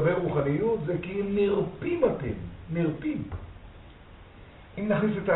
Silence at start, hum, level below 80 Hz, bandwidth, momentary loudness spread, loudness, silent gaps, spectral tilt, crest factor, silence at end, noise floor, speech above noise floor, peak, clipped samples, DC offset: 0 s; none; -50 dBFS; 4.1 kHz; 14 LU; -28 LUFS; none; -7 dB/octave; 18 dB; 0 s; -49 dBFS; 21 dB; -10 dBFS; under 0.1%; under 0.1%